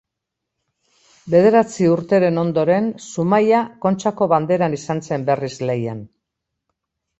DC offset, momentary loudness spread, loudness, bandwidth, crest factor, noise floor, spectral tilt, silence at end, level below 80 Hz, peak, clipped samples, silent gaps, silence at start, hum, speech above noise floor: under 0.1%; 9 LU; -18 LUFS; 8.2 kHz; 18 dB; -81 dBFS; -7 dB/octave; 1.15 s; -60 dBFS; -2 dBFS; under 0.1%; none; 1.25 s; none; 64 dB